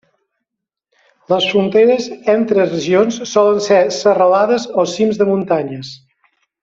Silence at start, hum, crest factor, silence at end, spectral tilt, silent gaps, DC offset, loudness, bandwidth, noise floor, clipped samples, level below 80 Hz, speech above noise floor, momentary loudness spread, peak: 1.3 s; none; 14 dB; 0.65 s; -5 dB/octave; none; under 0.1%; -14 LUFS; 7.8 kHz; -80 dBFS; under 0.1%; -60 dBFS; 67 dB; 7 LU; -2 dBFS